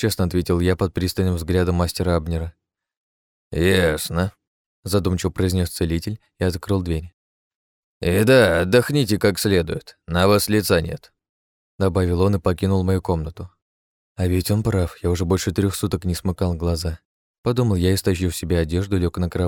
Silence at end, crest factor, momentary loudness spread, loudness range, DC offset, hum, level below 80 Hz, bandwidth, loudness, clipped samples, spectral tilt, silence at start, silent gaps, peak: 0 s; 20 dB; 10 LU; 5 LU; under 0.1%; none; -38 dBFS; 18.5 kHz; -21 LUFS; under 0.1%; -6 dB/octave; 0 s; 2.97-3.51 s, 4.47-4.83 s, 7.13-8.01 s, 11.29-11.79 s, 13.62-14.15 s, 17.05-17.44 s; -2 dBFS